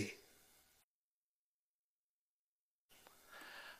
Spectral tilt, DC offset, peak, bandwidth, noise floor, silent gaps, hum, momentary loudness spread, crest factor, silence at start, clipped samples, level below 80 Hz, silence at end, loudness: -3.5 dB/octave; under 0.1%; -30 dBFS; 15.5 kHz; under -90 dBFS; 0.84-2.89 s; none; 16 LU; 26 dB; 0 s; under 0.1%; -86 dBFS; 0 s; -55 LUFS